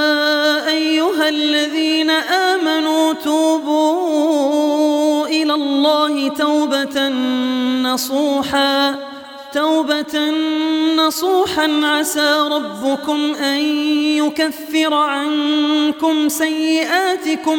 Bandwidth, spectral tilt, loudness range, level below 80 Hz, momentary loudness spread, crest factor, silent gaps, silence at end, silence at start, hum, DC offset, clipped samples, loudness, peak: 19 kHz; -2 dB/octave; 2 LU; -62 dBFS; 4 LU; 14 dB; none; 0 s; 0 s; none; under 0.1%; under 0.1%; -16 LUFS; -2 dBFS